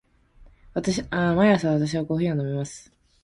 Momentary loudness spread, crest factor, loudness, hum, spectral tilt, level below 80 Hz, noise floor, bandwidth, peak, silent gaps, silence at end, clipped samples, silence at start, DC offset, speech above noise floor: 13 LU; 16 dB; -24 LUFS; none; -6.5 dB/octave; -50 dBFS; -53 dBFS; 11.5 kHz; -8 dBFS; none; 0.45 s; under 0.1%; 0.4 s; under 0.1%; 30 dB